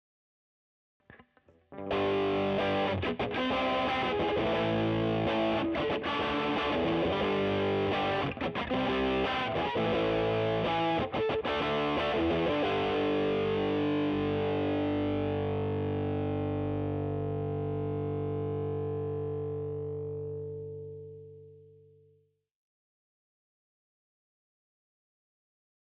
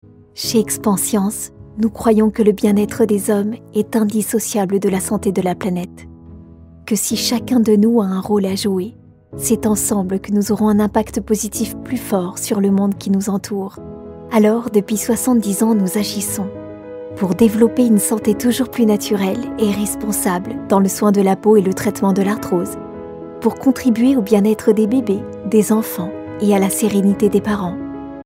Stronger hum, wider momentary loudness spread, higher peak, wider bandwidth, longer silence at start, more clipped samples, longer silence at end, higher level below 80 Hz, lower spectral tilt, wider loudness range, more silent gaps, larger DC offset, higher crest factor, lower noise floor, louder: first, 50 Hz at -60 dBFS vs none; second, 7 LU vs 11 LU; second, -20 dBFS vs 0 dBFS; second, 6.6 kHz vs 16.5 kHz; first, 1.1 s vs 0.35 s; neither; first, 4.4 s vs 0.05 s; second, -56 dBFS vs -46 dBFS; first, -7.5 dB/octave vs -5.5 dB/octave; first, 8 LU vs 3 LU; neither; neither; about the same, 12 dB vs 16 dB; first, -69 dBFS vs -40 dBFS; second, -31 LUFS vs -17 LUFS